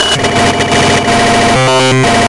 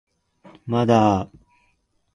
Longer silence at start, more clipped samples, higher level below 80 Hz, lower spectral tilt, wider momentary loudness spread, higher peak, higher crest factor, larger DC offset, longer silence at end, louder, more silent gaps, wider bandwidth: second, 0 s vs 0.65 s; neither; first, -34 dBFS vs -50 dBFS; second, -4 dB/octave vs -7.5 dB/octave; second, 2 LU vs 21 LU; first, 0 dBFS vs -4 dBFS; second, 8 dB vs 20 dB; neither; second, 0 s vs 0.9 s; first, -8 LUFS vs -20 LUFS; neither; about the same, 11.5 kHz vs 10.5 kHz